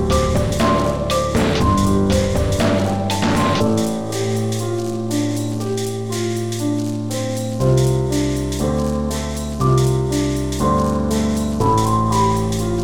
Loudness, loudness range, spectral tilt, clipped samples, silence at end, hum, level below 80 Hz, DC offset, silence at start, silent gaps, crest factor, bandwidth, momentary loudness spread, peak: -19 LUFS; 4 LU; -6 dB/octave; under 0.1%; 0 s; none; -30 dBFS; 1%; 0 s; none; 14 dB; 18.5 kHz; 6 LU; -4 dBFS